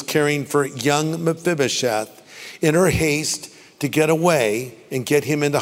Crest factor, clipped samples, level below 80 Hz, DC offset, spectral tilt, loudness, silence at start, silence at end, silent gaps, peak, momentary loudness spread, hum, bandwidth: 18 dB; under 0.1%; -48 dBFS; under 0.1%; -4.5 dB/octave; -20 LUFS; 0 s; 0 s; none; -2 dBFS; 11 LU; none; 16 kHz